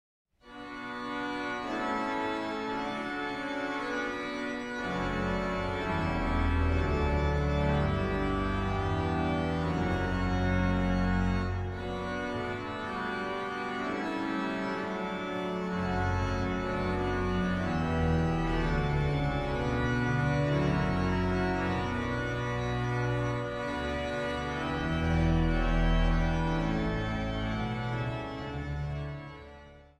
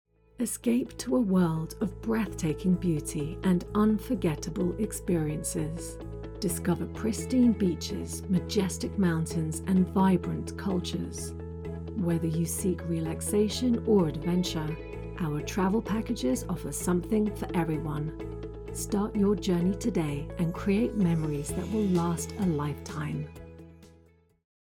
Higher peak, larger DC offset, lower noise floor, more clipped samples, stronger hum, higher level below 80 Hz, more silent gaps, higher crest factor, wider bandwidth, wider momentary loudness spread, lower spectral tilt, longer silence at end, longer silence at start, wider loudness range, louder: about the same, -16 dBFS vs -14 dBFS; neither; second, -51 dBFS vs -61 dBFS; neither; neither; first, -38 dBFS vs -46 dBFS; neither; about the same, 14 dB vs 16 dB; second, 10 kHz vs 19 kHz; second, 7 LU vs 10 LU; about the same, -7 dB/octave vs -6 dB/octave; second, 0.15 s vs 0.85 s; about the same, 0.45 s vs 0.4 s; about the same, 4 LU vs 2 LU; about the same, -31 LUFS vs -29 LUFS